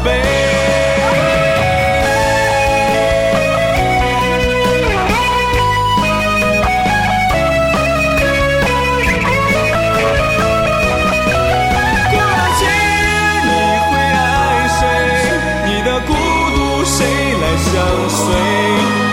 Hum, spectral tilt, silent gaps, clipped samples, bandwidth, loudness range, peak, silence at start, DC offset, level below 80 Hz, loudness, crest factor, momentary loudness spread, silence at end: none; -4.5 dB/octave; none; under 0.1%; 16.5 kHz; 1 LU; -2 dBFS; 0 s; under 0.1%; -24 dBFS; -13 LUFS; 10 dB; 2 LU; 0 s